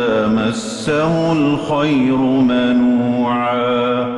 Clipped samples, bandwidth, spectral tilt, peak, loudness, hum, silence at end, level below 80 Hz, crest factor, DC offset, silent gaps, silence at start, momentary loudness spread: under 0.1%; 11.5 kHz; -6 dB/octave; -6 dBFS; -16 LUFS; none; 0 s; -46 dBFS; 10 dB; under 0.1%; none; 0 s; 3 LU